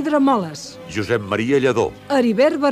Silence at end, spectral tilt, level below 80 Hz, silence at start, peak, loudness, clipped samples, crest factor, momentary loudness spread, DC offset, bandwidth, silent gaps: 0 s; -6 dB/octave; -52 dBFS; 0 s; -4 dBFS; -19 LUFS; under 0.1%; 14 dB; 12 LU; under 0.1%; 14 kHz; none